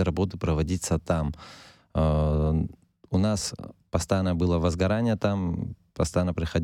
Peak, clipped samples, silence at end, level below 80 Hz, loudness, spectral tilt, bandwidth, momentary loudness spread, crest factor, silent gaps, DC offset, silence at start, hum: -10 dBFS; under 0.1%; 0 s; -36 dBFS; -27 LUFS; -6.5 dB/octave; 13.5 kHz; 9 LU; 16 dB; none; under 0.1%; 0 s; none